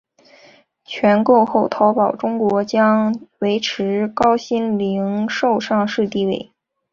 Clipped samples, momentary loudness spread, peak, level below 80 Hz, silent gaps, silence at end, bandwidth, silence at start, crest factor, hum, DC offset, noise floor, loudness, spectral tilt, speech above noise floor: under 0.1%; 7 LU; -2 dBFS; -58 dBFS; none; 0.5 s; 7.2 kHz; 0.9 s; 16 dB; none; under 0.1%; -50 dBFS; -18 LUFS; -6 dB/octave; 33 dB